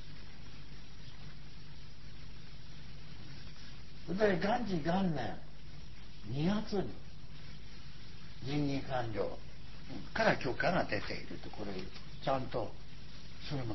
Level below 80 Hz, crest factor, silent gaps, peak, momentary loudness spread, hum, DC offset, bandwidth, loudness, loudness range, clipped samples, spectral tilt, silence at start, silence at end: -54 dBFS; 24 dB; none; -14 dBFS; 20 LU; none; 1%; 6.2 kHz; -36 LUFS; 16 LU; under 0.1%; -6.5 dB/octave; 0 s; 0 s